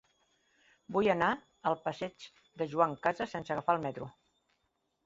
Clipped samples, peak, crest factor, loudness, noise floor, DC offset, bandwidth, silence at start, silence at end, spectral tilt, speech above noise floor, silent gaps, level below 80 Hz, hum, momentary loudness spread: under 0.1%; -12 dBFS; 22 dB; -33 LUFS; -80 dBFS; under 0.1%; 7.6 kHz; 0.9 s; 0.95 s; -4 dB/octave; 47 dB; none; -70 dBFS; none; 15 LU